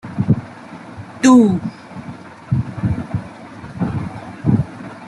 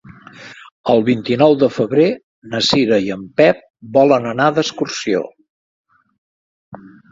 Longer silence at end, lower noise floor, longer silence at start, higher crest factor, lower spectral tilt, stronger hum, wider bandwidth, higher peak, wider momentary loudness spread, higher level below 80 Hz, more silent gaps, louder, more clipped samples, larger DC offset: second, 0 s vs 0.25 s; about the same, -35 dBFS vs -38 dBFS; about the same, 0.05 s vs 0.1 s; about the same, 18 dB vs 18 dB; first, -7 dB/octave vs -5 dB/octave; neither; first, 11.5 kHz vs 7.8 kHz; about the same, -2 dBFS vs 0 dBFS; first, 23 LU vs 13 LU; first, -44 dBFS vs -56 dBFS; second, none vs 0.72-0.84 s, 2.23-2.42 s, 3.70-3.74 s, 5.50-5.84 s, 6.18-6.72 s; about the same, -18 LUFS vs -16 LUFS; neither; neither